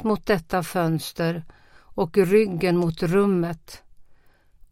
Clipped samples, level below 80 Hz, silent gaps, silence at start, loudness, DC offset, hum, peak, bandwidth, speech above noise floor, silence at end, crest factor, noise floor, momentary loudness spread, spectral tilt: under 0.1%; -50 dBFS; none; 0 s; -23 LUFS; under 0.1%; none; -6 dBFS; 16.5 kHz; 32 dB; 0.6 s; 18 dB; -54 dBFS; 10 LU; -6.5 dB/octave